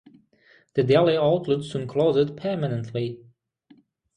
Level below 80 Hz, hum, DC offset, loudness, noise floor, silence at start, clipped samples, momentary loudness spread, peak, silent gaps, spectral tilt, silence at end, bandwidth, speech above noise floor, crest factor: -60 dBFS; none; under 0.1%; -23 LUFS; -59 dBFS; 0.75 s; under 0.1%; 11 LU; -6 dBFS; none; -7.5 dB/octave; 1 s; 10 kHz; 36 dB; 20 dB